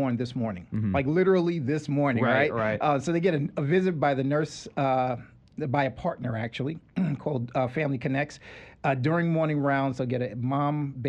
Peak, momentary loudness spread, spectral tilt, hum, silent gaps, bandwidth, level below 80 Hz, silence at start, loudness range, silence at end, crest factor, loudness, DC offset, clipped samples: -10 dBFS; 8 LU; -7.5 dB/octave; none; none; 9.4 kHz; -58 dBFS; 0 s; 5 LU; 0 s; 16 dB; -27 LUFS; under 0.1%; under 0.1%